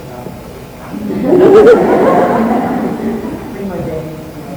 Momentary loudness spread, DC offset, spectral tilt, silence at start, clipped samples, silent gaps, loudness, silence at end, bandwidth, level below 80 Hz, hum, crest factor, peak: 22 LU; under 0.1%; -7.5 dB/octave; 0 s; 1%; none; -10 LUFS; 0 s; over 20 kHz; -38 dBFS; none; 12 dB; 0 dBFS